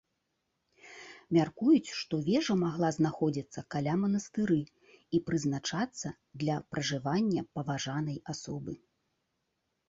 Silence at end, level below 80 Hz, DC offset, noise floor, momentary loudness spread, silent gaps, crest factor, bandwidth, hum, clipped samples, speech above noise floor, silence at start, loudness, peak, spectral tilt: 1.15 s; -66 dBFS; under 0.1%; -81 dBFS; 13 LU; none; 18 dB; 7.8 kHz; none; under 0.1%; 50 dB; 0.85 s; -32 LUFS; -14 dBFS; -6 dB/octave